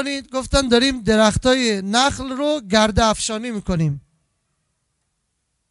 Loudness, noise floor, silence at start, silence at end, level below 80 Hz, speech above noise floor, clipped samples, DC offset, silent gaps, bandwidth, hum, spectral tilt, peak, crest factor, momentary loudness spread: -18 LUFS; -72 dBFS; 0 s; 1.7 s; -34 dBFS; 54 dB; under 0.1%; under 0.1%; none; 11.5 kHz; none; -4 dB/octave; -2 dBFS; 18 dB; 9 LU